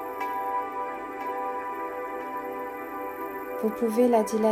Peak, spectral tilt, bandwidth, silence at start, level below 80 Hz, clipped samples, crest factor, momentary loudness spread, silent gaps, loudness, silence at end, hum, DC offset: -10 dBFS; -5.5 dB/octave; 16 kHz; 0 s; -66 dBFS; under 0.1%; 18 dB; 12 LU; none; -29 LUFS; 0 s; none; under 0.1%